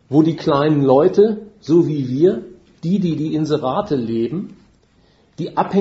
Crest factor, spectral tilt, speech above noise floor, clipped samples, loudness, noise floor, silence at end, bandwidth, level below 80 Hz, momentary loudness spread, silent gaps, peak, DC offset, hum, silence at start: 18 dB; -8.5 dB/octave; 38 dB; under 0.1%; -17 LUFS; -55 dBFS; 0 s; 7.8 kHz; -56 dBFS; 14 LU; none; 0 dBFS; under 0.1%; none; 0.1 s